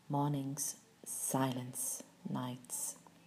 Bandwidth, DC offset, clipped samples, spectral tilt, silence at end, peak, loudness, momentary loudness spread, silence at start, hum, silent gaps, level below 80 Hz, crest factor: 15.5 kHz; under 0.1%; under 0.1%; -4.5 dB/octave; 0.1 s; -22 dBFS; -39 LUFS; 8 LU; 0.1 s; none; none; -84 dBFS; 18 dB